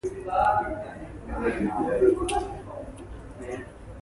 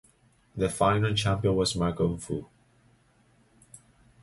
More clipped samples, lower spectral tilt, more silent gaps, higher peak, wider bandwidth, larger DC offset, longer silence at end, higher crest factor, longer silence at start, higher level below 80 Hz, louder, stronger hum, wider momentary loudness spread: neither; about the same, -6 dB/octave vs -5.5 dB/octave; neither; about the same, -10 dBFS vs -10 dBFS; about the same, 11.5 kHz vs 11.5 kHz; neither; second, 0 s vs 0.45 s; about the same, 18 dB vs 18 dB; second, 0.05 s vs 0.55 s; about the same, -44 dBFS vs -48 dBFS; about the same, -27 LUFS vs -27 LUFS; neither; first, 18 LU vs 11 LU